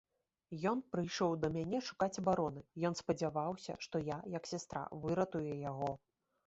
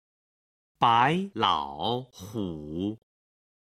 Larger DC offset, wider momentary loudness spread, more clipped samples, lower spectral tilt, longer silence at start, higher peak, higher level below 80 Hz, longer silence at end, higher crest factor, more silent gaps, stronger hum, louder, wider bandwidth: neither; second, 7 LU vs 13 LU; neither; about the same, -5.5 dB/octave vs -5.5 dB/octave; second, 0.5 s vs 0.8 s; second, -20 dBFS vs -8 dBFS; second, -68 dBFS vs -60 dBFS; second, 0.5 s vs 0.75 s; about the same, 20 dB vs 22 dB; neither; neither; second, -39 LUFS vs -27 LUFS; second, 8 kHz vs 15 kHz